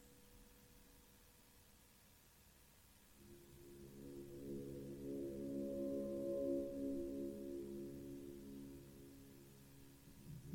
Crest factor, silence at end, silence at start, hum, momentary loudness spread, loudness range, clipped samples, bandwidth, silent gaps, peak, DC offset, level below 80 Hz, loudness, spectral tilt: 18 dB; 0 s; 0 s; none; 22 LU; 19 LU; under 0.1%; 16.5 kHz; none; -32 dBFS; under 0.1%; -70 dBFS; -48 LUFS; -7 dB/octave